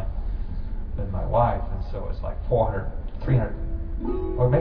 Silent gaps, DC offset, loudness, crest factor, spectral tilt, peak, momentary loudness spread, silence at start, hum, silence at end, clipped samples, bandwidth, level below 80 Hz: none; under 0.1%; -27 LUFS; 16 dB; -11.5 dB/octave; -8 dBFS; 11 LU; 0 s; none; 0 s; under 0.1%; 5.2 kHz; -28 dBFS